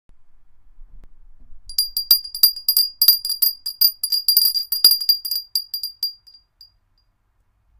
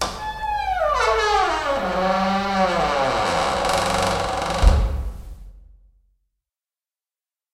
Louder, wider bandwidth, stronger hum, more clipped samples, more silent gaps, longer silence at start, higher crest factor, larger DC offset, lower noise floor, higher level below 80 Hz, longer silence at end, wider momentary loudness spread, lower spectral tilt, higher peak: first, -16 LUFS vs -21 LUFS; about the same, 16.5 kHz vs 15 kHz; neither; neither; neither; first, 0.2 s vs 0 s; about the same, 22 dB vs 18 dB; neither; second, -64 dBFS vs under -90 dBFS; second, -50 dBFS vs -28 dBFS; second, 1.7 s vs 1.9 s; first, 11 LU vs 8 LU; second, 3 dB/octave vs -4.5 dB/octave; first, 0 dBFS vs -4 dBFS